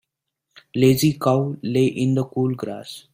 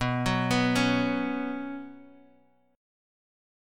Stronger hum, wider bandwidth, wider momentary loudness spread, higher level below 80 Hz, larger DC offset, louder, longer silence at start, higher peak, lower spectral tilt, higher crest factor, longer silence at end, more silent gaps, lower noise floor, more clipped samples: neither; about the same, 16 kHz vs 15.5 kHz; about the same, 13 LU vs 15 LU; about the same, -56 dBFS vs -52 dBFS; neither; first, -21 LUFS vs -27 LUFS; first, 0.75 s vs 0 s; first, -4 dBFS vs -12 dBFS; about the same, -6.5 dB/octave vs -5.5 dB/octave; about the same, 18 dB vs 18 dB; second, 0.15 s vs 1.7 s; neither; first, -79 dBFS vs -63 dBFS; neither